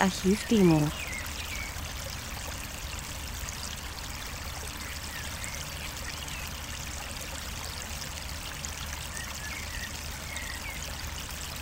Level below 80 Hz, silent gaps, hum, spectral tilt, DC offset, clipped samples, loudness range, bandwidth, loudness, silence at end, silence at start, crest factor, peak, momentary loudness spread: -42 dBFS; none; none; -4 dB/octave; under 0.1%; under 0.1%; 6 LU; 16 kHz; -33 LUFS; 0 s; 0 s; 24 dB; -8 dBFS; 10 LU